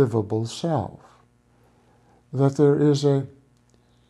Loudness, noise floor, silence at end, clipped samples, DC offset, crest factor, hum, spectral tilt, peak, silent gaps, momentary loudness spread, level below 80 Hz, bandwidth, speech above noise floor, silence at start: -22 LUFS; -59 dBFS; 0.8 s; under 0.1%; under 0.1%; 16 dB; 60 Hz at -55 dBFS; -7.5 dB/octave; -8 dBFS; none; 15 LU; -62 dBFS; 11.5 kHz; 39 dB; 0 s